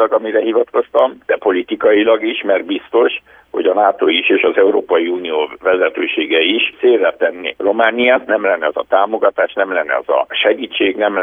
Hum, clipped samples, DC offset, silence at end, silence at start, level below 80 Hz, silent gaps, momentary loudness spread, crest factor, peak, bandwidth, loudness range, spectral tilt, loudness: none; under 0.1%; under 0.1%; 0 s; 0 s; -60 dBFS; none; 5 LU; 14 dB; 0 dBFS; 3.8 kHz; 1 LU; -6 dB/octave; -14 LUFS